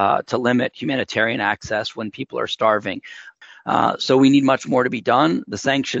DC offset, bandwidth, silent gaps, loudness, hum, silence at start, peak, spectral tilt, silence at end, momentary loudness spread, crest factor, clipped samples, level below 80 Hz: under 0.1%; 7.8 kHz; none; -19 LUFS; none; 0 s; -4 dBFS; -5 dB/octave; 0 s; 13 LU; 16 dB; under 0.1%; -60 dBFS